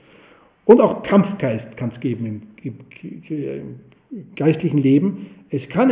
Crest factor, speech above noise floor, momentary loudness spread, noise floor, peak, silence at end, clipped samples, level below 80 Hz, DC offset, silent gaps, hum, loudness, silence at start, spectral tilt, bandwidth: 20 dB; 32 dB; 23 LU; -51 dBFS; 0 dBFS; 0 s; under 0.1%; -58 dBFS; under 0.1%; none; none; -19 LUFS; 0.65 s; -12.5 dB/octave; 4 kHz